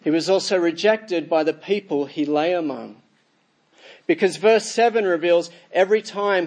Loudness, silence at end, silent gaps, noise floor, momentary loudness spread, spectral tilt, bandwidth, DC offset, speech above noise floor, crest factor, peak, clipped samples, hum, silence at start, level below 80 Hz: -20 LUFS; 0 s; none; -64 dBFS; 8 LU; -4 dB/octave; 10 kHz; under 0.1%; 44 dB; 16 dB; -4 dBFS; under 0.1%; none; 0.05 s; -80 dBFS